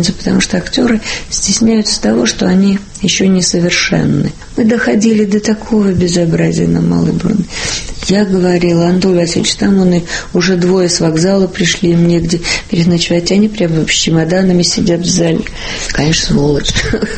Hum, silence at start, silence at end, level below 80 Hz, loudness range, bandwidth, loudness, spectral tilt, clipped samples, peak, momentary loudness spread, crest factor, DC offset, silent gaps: none; 0 s; 0 s; -30 dBFS; 1 LU; 8.8 kHz; -11 LUFS; -4.5 dB/octave; under 0.1%; 0 dBFS; 5 LU; 12 dB; under 0.1%; none